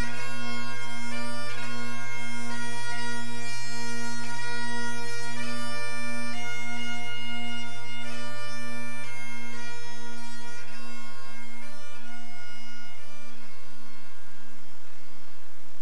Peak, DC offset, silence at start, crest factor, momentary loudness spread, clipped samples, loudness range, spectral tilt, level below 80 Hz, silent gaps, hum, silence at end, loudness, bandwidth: -14 dBFS; 10%; 0 s; 16 dB; 16 LU; under 0.1%; 12 LU; -3.5 dB/octave; -64 dBFS; none; none; 0 s; -36 LUFS; 11 kHz